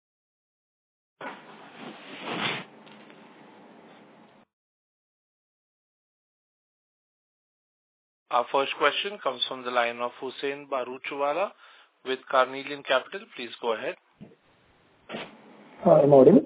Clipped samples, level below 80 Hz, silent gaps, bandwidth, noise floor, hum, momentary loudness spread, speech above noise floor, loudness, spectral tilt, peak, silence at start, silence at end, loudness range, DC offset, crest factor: under 0.1%; -72 dBFS; 4.53-8.26 s; 4 kHz; -62 dBFS; none; 20 LU; 38 dB; -26 LUFS; -9.5 dB/octave; -4 dBFS; 1.2 s; 0 s; 9 LU; under 0.1%; 24 dB